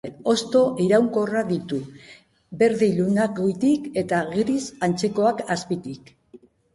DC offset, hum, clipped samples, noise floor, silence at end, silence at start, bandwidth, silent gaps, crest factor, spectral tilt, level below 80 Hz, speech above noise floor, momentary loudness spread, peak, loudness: under 0.1%; none; under 0.1%; -51 dBFS; 0.4 s; 0.05 s; 11.5 kHz; none; 16 dB; -6 dB/octave; -60 dBFS; 29 dB; 11 LU; -6 dBFS; -22 LUFS